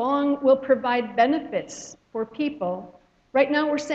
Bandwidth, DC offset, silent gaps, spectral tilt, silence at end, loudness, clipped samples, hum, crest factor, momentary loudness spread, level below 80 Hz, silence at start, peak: 8 kHz; under 0.1%; none; -4.5 dB/octave; 0 s; -23 LUFS; under 0.1%; none; 18 dB; 14 LU; -66 dBFS; 0 s; -6 dBFS